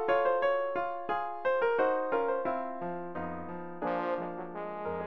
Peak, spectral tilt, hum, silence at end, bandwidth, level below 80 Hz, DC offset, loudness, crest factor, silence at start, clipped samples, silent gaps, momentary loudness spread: -16 dBFS; -4 dB/octave; none; 0 s; 5.8 kHz; -68 dBFS; 0.5%; -32 LUFS; 16 dB; 0 s; under 0.1%; none; 11 LU